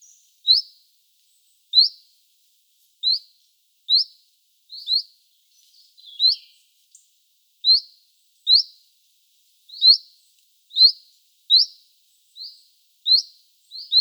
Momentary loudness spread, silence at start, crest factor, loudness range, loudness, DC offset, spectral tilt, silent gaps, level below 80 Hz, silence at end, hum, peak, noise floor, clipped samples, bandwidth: 24 LU; 0.45 s; 20 dB; 6 LU; -17 LUFS; under 0.1%; 8 dB/octave; none; under -90 dBFS; 0 s; none; -2 dBFS; -63 dBFS; under 0.1%; over 20 kHz